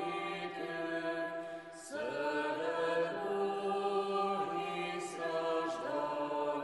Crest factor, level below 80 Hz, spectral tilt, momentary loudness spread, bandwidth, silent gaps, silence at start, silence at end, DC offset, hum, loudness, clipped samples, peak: 14 dB; -82 dBFS; -4.5 dB/octave; 6 LU; 11.5 kHz; none; 0 s; 0 s; under 0.1%; none; -37 LUFS; under 0.1%; -22 dBFS